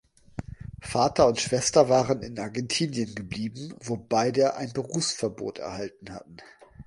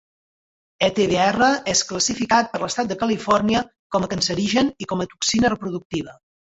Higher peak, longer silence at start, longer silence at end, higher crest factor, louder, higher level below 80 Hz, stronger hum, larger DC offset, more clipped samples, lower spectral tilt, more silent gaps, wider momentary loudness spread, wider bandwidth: about the same, -4 dBFS vs -4 dBFS; second, 0.4 s vs 0.8 s; second, 0.05 s vs 0.45 s; about the same, 22 dB vs 18 dB; second, -26 LUFS vs -21 LUFS; about the same, -52 dBFS vs -50 dBFS; neither; neither; neither; about the same, -4 dB/octave vs -3.5 dB/octave; second, none vs 3.79-3.90 s, 5.85-5.90 s; first, 19 LU vs 9 LU; first, 11.5 kHz vs 8.2 kHz